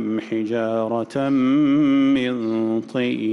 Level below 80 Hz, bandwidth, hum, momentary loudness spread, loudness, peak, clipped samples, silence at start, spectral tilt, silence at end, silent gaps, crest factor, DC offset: -62 dBFS; 6.8 kHz; none; 7 LU; -20 LUFS; -10 dBFS; under 0.1%; 0 s; -7.5 dB/octave; 0 s; none; 8 dB; under 0.1%